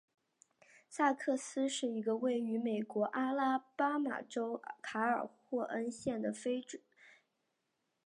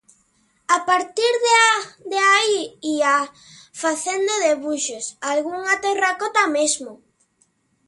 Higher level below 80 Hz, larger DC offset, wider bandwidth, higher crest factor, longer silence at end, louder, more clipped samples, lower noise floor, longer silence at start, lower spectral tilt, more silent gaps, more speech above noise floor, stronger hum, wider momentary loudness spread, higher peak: second, -82 dBFS vs -70 dBFS; neither; about the same, 11.5 kHz vs 11.5 kHz; about the same, 20 dB vs 20 dB; about the same, 0.95 s vs 0.9 s; second, -37 LUFS vs -19 LUFS; neither; first, -84 dBFS vs -64 dBFS; first, 0.9 s vs 0.7 s; first, -4 dB/octave vs 0 dB/octave; neither; first, 48 dB vs 44 dB; neither; second, 7 LU vs 11 LU; second, -18 dBFS vs 0 dBFS